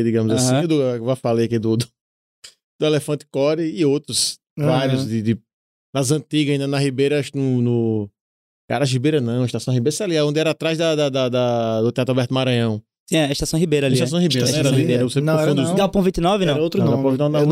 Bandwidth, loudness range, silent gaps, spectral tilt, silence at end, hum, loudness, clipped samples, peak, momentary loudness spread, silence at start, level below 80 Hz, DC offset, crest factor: 15.5 kHz; 3 LU; 2.01-2.42 s, 2.64-2.79 s, 4.50-4.56 s, 5.54-5.93 s, 8.21-8.68 s, 13.00-13.06 s; -5.5 dB/octave; 0 s; none; -19 LUFS; under 0.1%; -8 dBFS; 5 LU; 0 s; -48 dBFS; under 0.1%; 12 dB